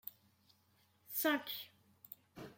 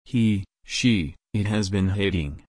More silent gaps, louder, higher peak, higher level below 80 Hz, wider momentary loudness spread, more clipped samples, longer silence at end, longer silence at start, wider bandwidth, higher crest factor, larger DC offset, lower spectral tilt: neither; second, -38 LUFS vs -24 LUFS; second, -20 dBFS vs -8 dBFS; second, -84 dBFS vs -42 dBFS; first, 20 LU vs 7 LU; neither; about the same, 0.05 s vs 0.1 s; about the same, 0.05 s vs 0.1 s; first, 16.5 kHz vs 10.5 kHz; first, 24 dB vs 16 dB; neither; second, -2.5 dB/octave vs -5.5 dB/octave